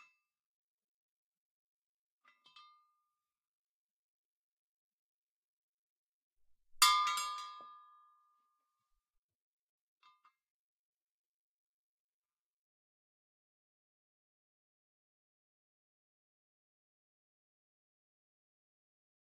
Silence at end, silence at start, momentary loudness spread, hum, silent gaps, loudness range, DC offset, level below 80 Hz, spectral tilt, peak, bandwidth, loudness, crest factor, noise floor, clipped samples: 11.5 s; 6.75 s; 22 LU; none; none; 9 LU; under 0.1%; -82 dBFS; 6.5 dB/octave; -12 dBFS; 7.4 kHz; -31 LUFS; 34 dB; -89 dBFS; under 0.1%